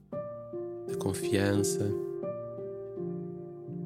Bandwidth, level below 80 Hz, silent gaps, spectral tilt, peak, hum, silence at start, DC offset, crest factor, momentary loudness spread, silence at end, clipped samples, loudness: 16 kHz; -68 dBFS; none; -5.5 dB/octave; -12 dBFS; none; 0 s; under 0.1%; 20 dB; 12 LU; 0 s; under 0.1%; -34 LUFS